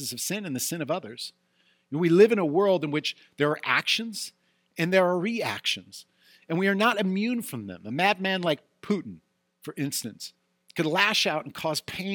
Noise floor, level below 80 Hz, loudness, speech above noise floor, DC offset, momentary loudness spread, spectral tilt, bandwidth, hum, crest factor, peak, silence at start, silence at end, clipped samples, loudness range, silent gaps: -67 dBFS; -74 dBFS; -26 LUFS; 41 dB; under 0.1%; 16 LU; -4 dB/octave; 19 kHz; none; 22 dB; -6 dBFS; 0 s; 0 s; under 0.1%; 4 LU; none